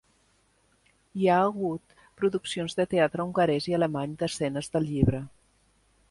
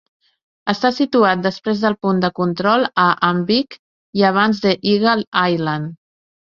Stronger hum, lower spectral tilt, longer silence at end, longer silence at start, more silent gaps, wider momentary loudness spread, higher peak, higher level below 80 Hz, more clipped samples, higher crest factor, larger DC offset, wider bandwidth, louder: neither; about the same, -6 dB/octave vs -6.5 dB/octave; first, 0.8 s vs 0.55 s; first, 1.15 s vs 0.65 s; second, none vs 3.79-4.13 s, 5.27-5.32 s; about the same, 8 LU vs 8 LU; second, -8 dBFS vs -2 dBFS; first, -50 dBFS vs -58 dBFS; neither; first, 22 dB vs 16 dB; neither; first, 11.5 kHz vs 7 kHz; second, -27 LUFS vs -17 LUFS